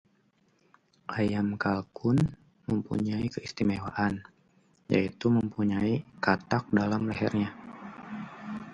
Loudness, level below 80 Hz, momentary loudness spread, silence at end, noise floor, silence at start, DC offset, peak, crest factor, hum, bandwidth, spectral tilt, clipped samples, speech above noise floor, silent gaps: -30 LUFS; -56 dBFS; 14 LU; 0 s; -68 dBFS; 1.1 s; under 0.1%; -6 dBFS; 24 dB; none; 9 kHz; -7.5 dB/octave; under 0.1%; 40 dB; none